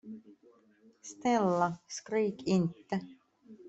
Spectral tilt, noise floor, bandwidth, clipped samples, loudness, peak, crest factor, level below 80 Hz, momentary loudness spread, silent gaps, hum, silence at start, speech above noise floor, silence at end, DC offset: -6 dB/octave; -64 dBFS; 8.2 kHz; under 0.1%; -32 LUFS; -16 dBFS; 18 dB; -72 dBFS; 21 LU; none; none; 0.05 s; 32 dB; 0 s; under 0.1%